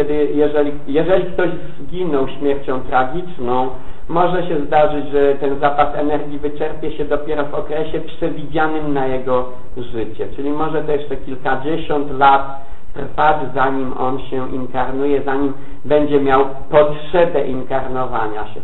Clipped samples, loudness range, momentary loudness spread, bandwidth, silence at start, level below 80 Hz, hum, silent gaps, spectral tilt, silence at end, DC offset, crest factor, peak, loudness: under 0.1%; 4 LU; 10 LU; 8.2 kHz; 0 s; -36 dBFS; none; none; -8.5 dB/octave; 0 s; 10%; 18 dB; -2 dBFS; -18 LUFS